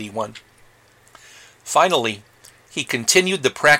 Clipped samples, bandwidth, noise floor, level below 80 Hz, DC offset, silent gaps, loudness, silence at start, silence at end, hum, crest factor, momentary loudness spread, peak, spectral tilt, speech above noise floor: under 0.1%; 17 kHz; -53 dBFS; -62 dBFS; under 0.1%; none; -19 LUFS; 0 s; 0 s; none; 20 dB; 16 LU; -2 dBFS; -2 dB/octave; 34 dB